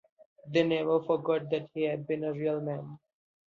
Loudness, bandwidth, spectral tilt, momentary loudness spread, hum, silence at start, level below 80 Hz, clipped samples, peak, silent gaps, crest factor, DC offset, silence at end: -31 LUFS; 7.2 kHz; -7.5 dB/octave; 8 LU; none; 0.45 s; -74 dBFS; under 0.1%; -12 dBFS; none; 18 dB; under 0.1%; 0.55 s